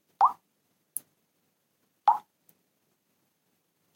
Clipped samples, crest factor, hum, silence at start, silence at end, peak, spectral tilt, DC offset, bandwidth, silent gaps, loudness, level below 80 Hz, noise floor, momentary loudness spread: under 0.1%; 24 dB; none; 0.2 s; 1.75 s; -10 dBFS; -0.5 dB/octave; under 0.1%; 16.5 kHz; none; -29 LUFS; under -90 dBFS; -75 dBFS; 13 LU